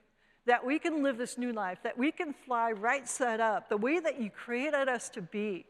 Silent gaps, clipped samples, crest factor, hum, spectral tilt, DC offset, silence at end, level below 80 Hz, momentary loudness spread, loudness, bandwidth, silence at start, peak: none; under 0.1%; 20 dB; none; -4 dB/octave; under 0.1%; 0.05 s; -78 dBFS; 7 LU; -32 LUFS; 14 kHz; 0.45 s; -12 dBFS